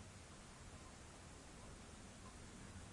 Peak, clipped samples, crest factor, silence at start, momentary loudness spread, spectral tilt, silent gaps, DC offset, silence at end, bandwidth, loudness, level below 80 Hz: -44 dBFS; under 0.1%; 14 dB; 0 s; 2 LU; -4 dB/octave; none; under 0.1%; 0 s; 11.5 kHz; -58 LUFS; -64 dBFS